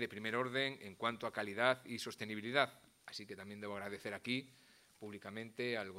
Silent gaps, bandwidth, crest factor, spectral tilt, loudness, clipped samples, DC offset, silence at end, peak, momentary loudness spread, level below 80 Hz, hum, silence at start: none; 16 kHz; 26 dB; -4 dB/octave; -40 LUFS; under 0.1%; under 0.1%; 0 s; -16 dBFS; 15 LU; -84 dBFS; none; 0 s